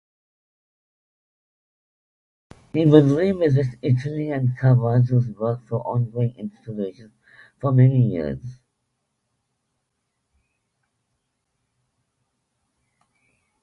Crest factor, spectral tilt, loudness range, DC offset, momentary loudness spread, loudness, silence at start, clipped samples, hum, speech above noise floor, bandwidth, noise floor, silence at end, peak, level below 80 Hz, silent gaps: 22 dB; -10 dB/octave; 5 LU; under 0.1%; 15 LU; -20 LUFS; 2.75 s; under 0.1%; none; 57 dB; 6.4 kHz; -76 dBFS; 5.1 s; 0 dBFS; -56 dBFS; none